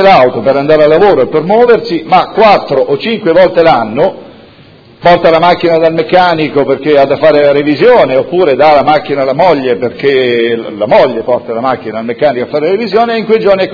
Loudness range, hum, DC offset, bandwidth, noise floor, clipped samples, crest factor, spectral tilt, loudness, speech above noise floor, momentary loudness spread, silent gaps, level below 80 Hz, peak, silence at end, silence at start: 3 LU; none; under 0.1%; 5.4 kHz; -37 dBFS; 3%; 8 dB; -7.5 dB/octave; -8 LUFS; 30 dB; 7 LU; none; -42 dBFS; 0 dBFS; 0 s; 0 s